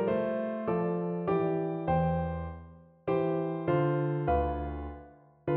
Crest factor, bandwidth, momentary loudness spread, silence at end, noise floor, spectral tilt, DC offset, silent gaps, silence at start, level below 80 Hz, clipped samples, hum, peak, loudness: 14 dB; 4.3 kHz; 12 LU; 0 s; -53 dBFS; -12 dB/octave; under 0.1%; none; 0 s; -46 dBFS; under 0.1%; none; -16 dBFS; -31 LUFS